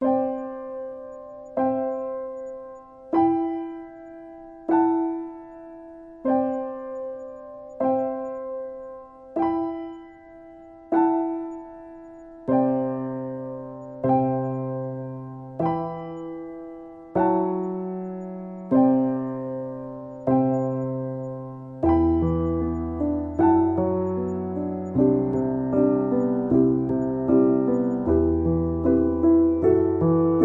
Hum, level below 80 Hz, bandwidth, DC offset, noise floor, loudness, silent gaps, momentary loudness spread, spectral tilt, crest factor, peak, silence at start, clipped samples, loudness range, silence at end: none; -48 dBFS; 3.2 kHz; under 0.1%; -45 dBFS; -24 LUFS; none; 19 LU; -11.5 dB/octave; 16 dB; -8 dBFS; 0 s; under 0.1%; 7 LU; 0 s